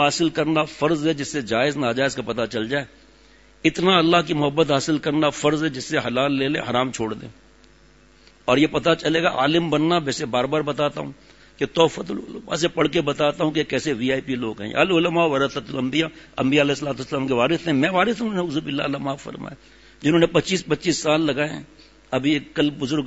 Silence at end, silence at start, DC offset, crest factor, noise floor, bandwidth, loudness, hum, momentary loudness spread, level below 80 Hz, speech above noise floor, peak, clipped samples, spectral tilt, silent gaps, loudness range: 0 s; 0 s; under 0.1%; 20 dB; -53 dBFS; 8 kHz; -21 LUFS; none; 9 LU; -52 dBFS; 31 dB; -2 dBFS; under 0.1%; -5 dB/octave; none; 3 LU